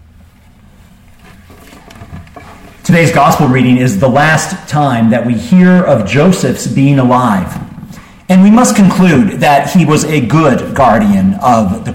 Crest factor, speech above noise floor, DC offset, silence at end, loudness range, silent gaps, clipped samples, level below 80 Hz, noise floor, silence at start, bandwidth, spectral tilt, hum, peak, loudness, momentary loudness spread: 10 dB; 33 dB; under 0.1%; 0 s; 4 LU; none; under 0.1%; -38 dBFS; -41 dBFS; 2 s; 16.5 kHz; -6 dB/octave; none; 0 dBFS; -9 LUFS; 7 LU